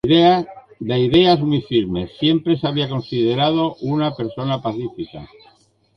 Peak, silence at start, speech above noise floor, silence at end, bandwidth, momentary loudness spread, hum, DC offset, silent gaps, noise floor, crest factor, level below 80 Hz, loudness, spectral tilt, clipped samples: -2 dBFS; 0.05 s; 37 dB; 0.7 s; 6.2 kHz; 15 LU; none; under 0.1%; none; -55 dBFS; 16 dB; -48 dBFS; -18 LUFS; -8 dB/octave; under 0.1%